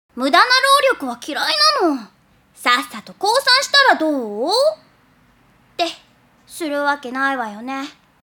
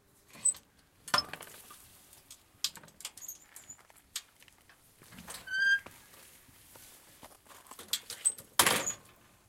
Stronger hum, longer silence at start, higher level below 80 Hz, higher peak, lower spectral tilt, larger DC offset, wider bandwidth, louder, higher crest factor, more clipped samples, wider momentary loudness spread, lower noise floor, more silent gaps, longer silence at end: neither; second, 0.15 s vs 0.35 s; about the same, -66 dBFS vs -70 dBFS; first, 0 dBFS vs -6 dBFS; first, -1 dB/octave vs 0.5 dB/octave; neither; about the same, 18 kHz vs 16.5 kHz; first, -16 LUFS vs -32 LUFS; second, 18 dB vs 32 dB; neither; second, 16 LU vs 26 LU; second, -54 dBFS vs -62 dBFS; neither; second, 0.35 s vs 0.5 s